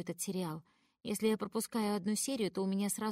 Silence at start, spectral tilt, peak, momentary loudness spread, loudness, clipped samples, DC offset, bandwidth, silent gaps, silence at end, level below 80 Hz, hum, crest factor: 0 s; -4.5 dB/octave; -20 dBFS; 8 LU; -36 LUFS; under 0.1%; under 0.1%; 16 kHz; none; 0 s; -76 dBFS; none; 16 dB